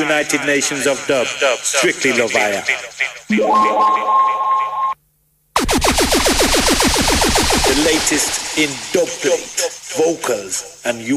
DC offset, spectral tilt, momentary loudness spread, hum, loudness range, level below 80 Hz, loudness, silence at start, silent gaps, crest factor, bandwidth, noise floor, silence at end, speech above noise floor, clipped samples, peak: under 0.1%; -2 dB/octave; 8 LU; none; 3 LU; -32 dBFS; -15 LUFS; 0 s; none; 16 dB; 15.5 kHz; -60 dBFS; 0 s; 43 dB; under 0.1%; -2 dBFS